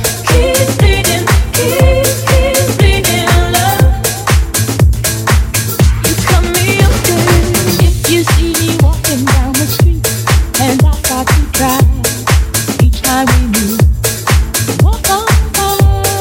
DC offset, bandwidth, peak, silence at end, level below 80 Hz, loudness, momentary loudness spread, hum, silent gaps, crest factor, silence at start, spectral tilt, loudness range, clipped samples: under 0.1%; 17.5 kHz; 0 dBFS; 0 s; -14 dBFS; -11 LUFS; 3 LU; none; none; 10 dB; 0 s; -4.5 dB/octave; 1 LU; under 0.1%